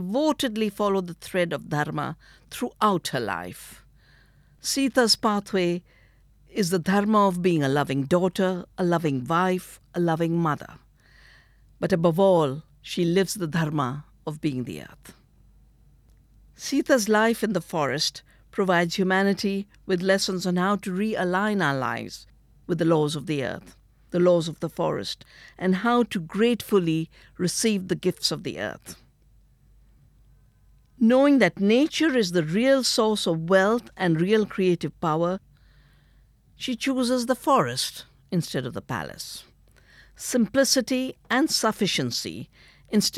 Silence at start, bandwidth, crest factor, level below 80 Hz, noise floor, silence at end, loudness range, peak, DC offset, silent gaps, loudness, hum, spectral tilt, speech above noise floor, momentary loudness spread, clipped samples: 0 s; 16 kHz; 20 dB; -58 dBFS; -58 dBFS; 0 s; 6 LU; -4 dBFS; under 0.1%; none; -24 LUFS; none; -5 dB/octave; 34 dB; 13 LU; under 0.1%